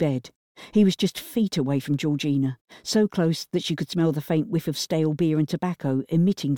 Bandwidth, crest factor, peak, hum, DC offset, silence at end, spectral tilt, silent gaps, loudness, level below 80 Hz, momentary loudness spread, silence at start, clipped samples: 19 kHz; 14 dB; -10 dBFS; none; under 0.1%; 0 s; -6.5 dB/octave; 0.35-0.55 s, 2.61-2.65 s; -24 LUFS; -62 dBFS; 6 LU; 0 s; under 0.1%